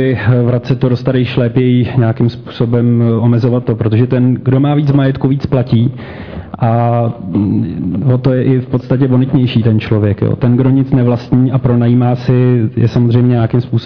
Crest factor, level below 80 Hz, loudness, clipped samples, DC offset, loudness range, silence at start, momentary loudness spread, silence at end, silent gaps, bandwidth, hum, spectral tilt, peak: 10 dB; -40 dBFS; -12 LUFS; under 0.1%; 0.6%; 3 LU; 0 s; 5 LU; 0 s; none; 5.4 kHz; none; -10.5 dB/octave; -2 dBFS